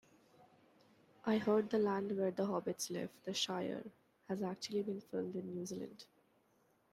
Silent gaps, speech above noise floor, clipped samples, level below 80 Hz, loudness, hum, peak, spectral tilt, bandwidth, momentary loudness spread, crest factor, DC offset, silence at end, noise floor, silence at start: none; 36 dB; under 0.1%; -82 dBFS; -39 LUFS; none; -22 dBFS; -4.5 dB/octave; 14.5 kHz; 12 LU; 20 dB; under 0.1%; 0.9 s; -75 dBFS; 0.4 s